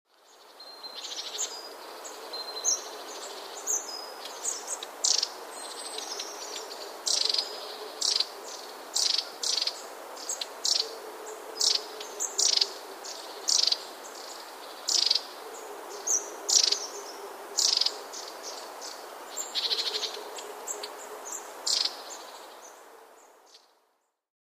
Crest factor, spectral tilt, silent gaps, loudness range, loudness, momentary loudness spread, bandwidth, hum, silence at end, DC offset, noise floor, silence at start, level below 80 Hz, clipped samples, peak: 24 dB; 3.5 dB/octave; none; 7 LU; -28 LUFS; 18 LU; 15.5 kHz; none; 0.9 s; under 0.1%; -74 dBFS; 0.3 s; -88 dBFS; under 0.1%; -8 dBFS